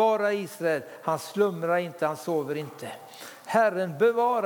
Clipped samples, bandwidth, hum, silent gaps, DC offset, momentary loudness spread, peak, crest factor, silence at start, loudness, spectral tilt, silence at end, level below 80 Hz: under 0.1%; 19 kHz; none; none; under 0.1%; 17 LU; -8 dBFS; 18 dB; 0 s; -27 LUFS; -5.5 dB/octave; 0 s; -84 dBFS